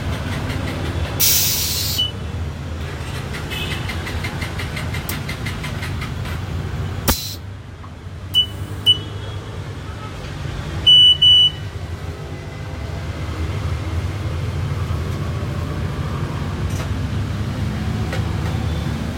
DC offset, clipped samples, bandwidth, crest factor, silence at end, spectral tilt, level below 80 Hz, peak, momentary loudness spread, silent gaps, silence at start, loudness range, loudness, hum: under 0.1%; under 0.1%; 16.5 kHz; 20 dB; 0 s; -3 dB/octave; -34 dBFS; -2 dBFS; 16 LU; none; 0 s; 11 LU; -19 LUFS; none